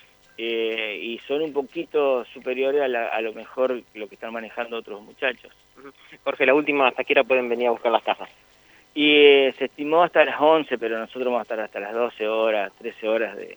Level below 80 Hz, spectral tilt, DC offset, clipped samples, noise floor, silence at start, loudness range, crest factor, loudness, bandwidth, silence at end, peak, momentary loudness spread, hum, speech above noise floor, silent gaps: -72 dBFS; -5 dB/octave; under 0.1%; under 0.1%; -55 dBFS; 0.4 s; 8 LU; 22 dB; -22 LUFS; over 20 kHz; 0 s; 0 dBFS; 14 LU; none; 32 dB; none